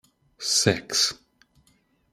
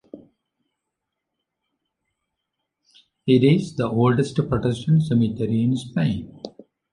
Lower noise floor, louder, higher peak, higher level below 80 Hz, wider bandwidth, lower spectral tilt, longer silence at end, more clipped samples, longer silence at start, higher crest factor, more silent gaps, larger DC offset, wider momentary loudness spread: second, -65 dBFS vs -82 dBFS; about the same, -23 LUFS vs -21 LUFS; about the same, -2 dBFS vs -4 dBFS; second, -62 dBFS vs -50 dBFS; first, 16 kHz vs 11 kHz; second, -2 dB/octave vs -8 dB/octave; first, 1 s vs 0.45 s; neither; first, 0.4 s vs 0.15 s; first, 26 dB vs 18 dB; neither; neither; second, 11 LU vs 14 LU